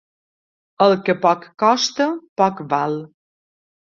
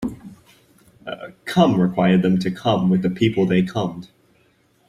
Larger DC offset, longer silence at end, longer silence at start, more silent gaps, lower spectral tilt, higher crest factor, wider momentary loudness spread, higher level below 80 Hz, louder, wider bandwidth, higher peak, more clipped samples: neither; about the same, 0.95 s vs 0.85 s; first, 0.8 s vs 0 s; first, 2.29-2.36 s vs none; second, -4.5 dB/octave vs -7.5 dB/octave; about the same, 18 dB vs 18 dB; second, 6 LU vs 17 LU; second, -66 dBFS vs -54 dBFS; about the same, -18 LUFS vs -19 LUFS; second, 7.6 kHz vs 11 kHz; about the same, -2 dBFS vs -2 dBFS; neither